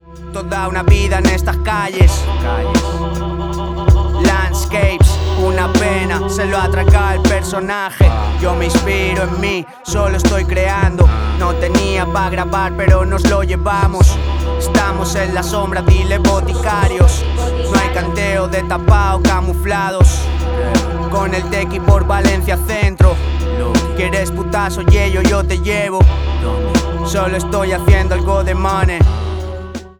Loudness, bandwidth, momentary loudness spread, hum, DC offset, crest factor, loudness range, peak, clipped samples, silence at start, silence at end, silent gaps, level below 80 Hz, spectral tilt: -14 LUFS; 19 kHz; 6 LU; none; under 0.1%; 14 dB; 1 LU; 0 dBFS; under 0.1%; 0.1 s; 0.1 s; none; -16 dBFS; -6 dB/octave